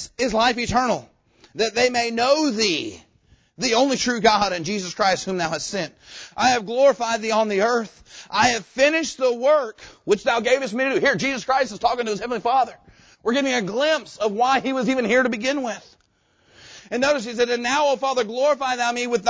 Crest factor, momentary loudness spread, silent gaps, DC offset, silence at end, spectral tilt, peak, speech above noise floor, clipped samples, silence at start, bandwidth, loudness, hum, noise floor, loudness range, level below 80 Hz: 18 dB; 8 LU; none; under 0.1%; 0 s; -3 dB/octave; -2 dBFS; 42 dB; under 0.1%; 0 s; 8 kHz; -21 LUFS; none; -63 dBFS; 2 LU; -54 dBFS